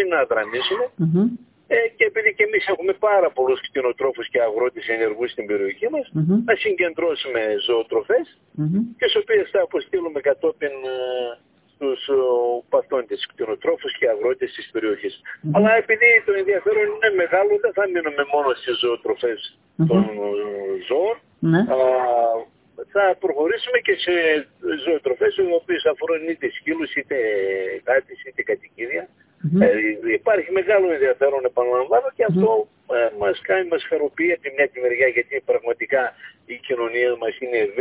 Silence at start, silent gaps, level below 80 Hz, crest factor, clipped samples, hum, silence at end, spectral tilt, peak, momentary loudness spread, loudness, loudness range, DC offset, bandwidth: 0 s; none; -62 dBFS; 18 dB; under 0.1%; none; 0 s; -9 dB/octave; -2 dBFS; 9 LU; -20 LUFS; 5 LU; under 0.1%; 4 kHz